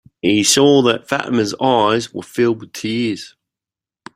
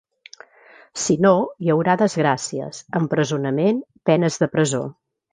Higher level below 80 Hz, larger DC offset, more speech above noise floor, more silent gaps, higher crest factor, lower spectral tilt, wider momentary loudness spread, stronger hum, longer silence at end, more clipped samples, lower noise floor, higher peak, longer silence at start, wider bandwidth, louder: first, -56 dBFS vs -62 dBFS; neither; first, 73 dB vs 30 dB; neither; about the same, 16 dB vs 18 dB; second, -3.5 dB/octave vs -5.5 dB/octave; about the same, 12 LU vs 10 LU; neither; first, 0.85 s vs 0.4 s; neither; first, -89 dBFS vs -50 dBFS; about the same, 0 dBFS vs -2 dBFS; second, 0.25 s vs 0.95 s; first, 16 kHz vs 9.8 kHz; first, -16 LUFS vs -20 LUFS